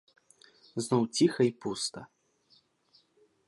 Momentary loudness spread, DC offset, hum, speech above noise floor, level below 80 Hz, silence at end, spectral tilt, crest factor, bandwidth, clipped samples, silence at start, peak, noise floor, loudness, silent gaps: 14 LU; under 0.1%; none; 39 dB; -74 dBFS; 1.45 s; -5 dB/octave; 20 dB; 11.5 kHz; under 0.1%; 0.75 s; -12 dBFS; -68 dBFS; -30 LUFS; none